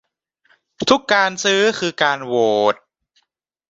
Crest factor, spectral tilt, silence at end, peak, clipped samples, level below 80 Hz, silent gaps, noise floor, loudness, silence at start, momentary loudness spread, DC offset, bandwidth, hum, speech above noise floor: 18 dB; -3 dB/octave; 0.95 s; -2 dBFS; under 0.1%; -62 dBFS; none; -71 dBFS; -17 LUFS; 0.8 s; 5 LU; under 0.1%; 8 kHz; none; 54 dB